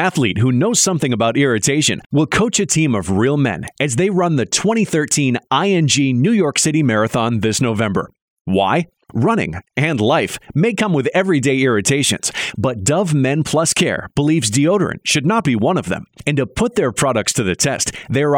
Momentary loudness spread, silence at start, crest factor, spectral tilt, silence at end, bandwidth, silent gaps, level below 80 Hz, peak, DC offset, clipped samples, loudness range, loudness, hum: 5 LU; 0 s; 14 dB; -4.5 dB/octave; 0 s; 17 kHz; 2.06-2.10 s, 8.22-8.45 s; -46 dBFS; -2 dBFS; under 0.1%; under 0.1%; 2 LU; -16 LUFS; none